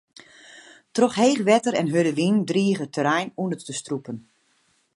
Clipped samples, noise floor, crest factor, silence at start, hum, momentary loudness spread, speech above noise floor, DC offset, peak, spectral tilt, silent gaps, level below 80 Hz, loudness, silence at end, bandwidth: under 0.1%; -66 dBFS; 20 dB; 0.55 s; none; 12 LU; 44 dB; under 0.1%; -4 dBFS; -5 dB/octave; none; -70 dBFS; -22 LUFS; 0.75 s; 11.5 kHz